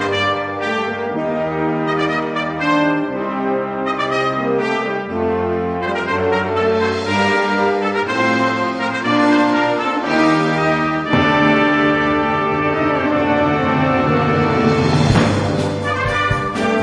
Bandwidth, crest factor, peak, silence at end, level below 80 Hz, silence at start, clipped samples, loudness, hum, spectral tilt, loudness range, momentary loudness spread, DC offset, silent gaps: 10.5 kHz; 16 dB; 0 dBFS; 0 s; -42 dBFS; 0 s; under 0.1%; -17 LUFS; none; -6 dB/octave; 4 LU; 6 LU; under 0.1%; none